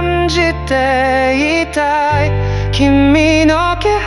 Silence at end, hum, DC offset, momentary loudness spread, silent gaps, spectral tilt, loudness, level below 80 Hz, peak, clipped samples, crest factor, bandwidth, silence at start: 0 s; none; under 0.1%; 5 LU; none; -5.5 dB/octave; -12 LUFS; -26 dBFS; 0 dBFS; under 0.1%; 12 dB; 12 kHz; 0 s